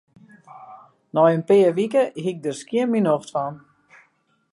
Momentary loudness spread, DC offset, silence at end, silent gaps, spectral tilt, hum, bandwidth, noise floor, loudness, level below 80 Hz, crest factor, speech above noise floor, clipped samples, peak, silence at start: 11 LU; under 0.1%; 0.95 s; none; -6.5 dB/octave; none; 11.5 kHz; -64 dBFS; -21 LUFS; -74 dBFS; 18 dB; 45 dB; under 0.1%; -4 dBFS; 0.55 s